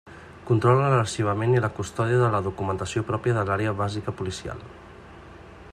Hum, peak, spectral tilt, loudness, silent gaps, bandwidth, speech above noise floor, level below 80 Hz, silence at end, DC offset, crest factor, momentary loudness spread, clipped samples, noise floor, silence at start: none; -6 dBFS; -6.5 dB/octave; -24 LUFS; none; 10.5 kHz; 21 dB; -52 dBFS; 0 s; under 0.1%; 18 dB; 20 LU; under 0.1%; -45 dBFS; 0.05 s